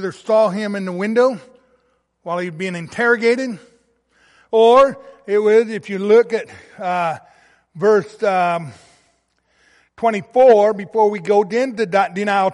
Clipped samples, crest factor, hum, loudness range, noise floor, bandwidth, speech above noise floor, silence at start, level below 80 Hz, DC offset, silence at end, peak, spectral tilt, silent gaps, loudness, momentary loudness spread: under 0.1%; 14 dB; none; 5 LU; -63 dBFS; 11.5 kHz; 47 dB; 0 s; -62 dBFS; under 0.1%; 0 s; -2 dBFS; -5.5 dB/octave; none; -17 LUFS; 14 LU